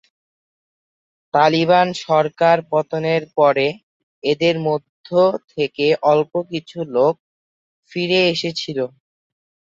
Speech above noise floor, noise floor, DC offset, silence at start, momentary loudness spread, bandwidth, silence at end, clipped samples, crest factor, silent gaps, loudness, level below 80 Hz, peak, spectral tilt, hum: over 73 dB; under -90 dBFS; under 0.1%; 1.35 s; 10 LU; 7.8 kHz; 0.75 s; under 0.1%; 18 dB; 3.83-4.22 s, 4.89-5.04 s, 7.20-7.83 s; -18 LUFS; -66 dBFS; -2 dBFS; -5.5 dB/octave; none